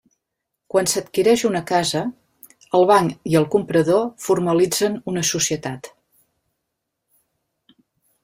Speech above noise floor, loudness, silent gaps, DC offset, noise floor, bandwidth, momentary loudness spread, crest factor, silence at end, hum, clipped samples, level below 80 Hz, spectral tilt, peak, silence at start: 61 dB; -19 LUFS; none; under 0.1%; -79 dBFS; 16 kHz; 7 LU; 20 dB; 2.35 s; none; under 0.1%; -60 dBFS; -4 dB/octave; -2 dBFS; 0.75 s